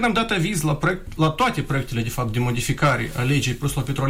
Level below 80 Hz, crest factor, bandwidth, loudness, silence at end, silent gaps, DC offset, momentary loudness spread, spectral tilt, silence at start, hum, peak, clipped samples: -36 dBFS; 16 dB; 16 kHz; -22 LUFS; 0 s; none; under 0.1%; 5 LU; -5 dB/octave; 0 s; none; -6 dBFS; under 0.1%